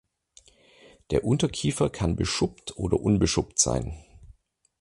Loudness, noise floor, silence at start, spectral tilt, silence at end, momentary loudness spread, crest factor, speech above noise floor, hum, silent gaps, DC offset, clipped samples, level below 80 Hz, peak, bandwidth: -26 LUFS; -58 dBFS; 1.1 s; -4.5 dB/octave; 0.5 s; 8 LU; 22 dB; 33 dB; none; none; under 0.1%; under 0.1%; -42 dBFS; -6 dBFS; 11.5 kHz